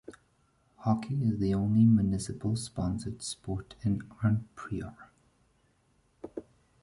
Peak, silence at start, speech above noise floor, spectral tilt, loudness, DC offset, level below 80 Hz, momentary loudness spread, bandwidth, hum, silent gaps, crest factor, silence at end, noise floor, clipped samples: -14 dBFS; 0.1 s; 40 dB; -7 dB/octave; -30 LUFS; under 0.1%; -52 dBFS; 20 LU; 11.5 kHz; none; none; 18 dB; 0.4 s; -69 dBFS; under 0.1%